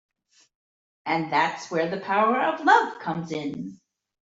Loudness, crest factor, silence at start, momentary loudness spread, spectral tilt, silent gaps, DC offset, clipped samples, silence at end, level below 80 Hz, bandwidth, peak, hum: -24 LUFS; 20 dB; 1.05 s; 14 LU; -5 dB/octave; none; under 0.1%; under 0.1%; 0.55 s; -72 dBFS; 8 kHz; -6 dBFS; none